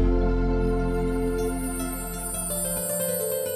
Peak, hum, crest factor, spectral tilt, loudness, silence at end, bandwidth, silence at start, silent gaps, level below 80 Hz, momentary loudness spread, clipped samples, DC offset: -12 dBFS; none; 12 dB; -5 dB/octave; -26 LUFS; 0 s; 15 kHz; 0 s; none; -30 dBFS; 5 LU; under 0.1%; under 0.1%